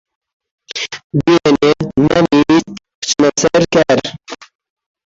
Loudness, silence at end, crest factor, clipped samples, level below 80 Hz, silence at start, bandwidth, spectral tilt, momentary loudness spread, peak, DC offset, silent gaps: -13 LUFS; 0.7 s; 14 dB; under 0.1%; -44 dBFS; 0.75 s; 7.8 kHz; -4.5 dB/octave; 16 LU; 0 dBFS; under 0.1%; 1.04-1.10 s, 2.95-3.02 s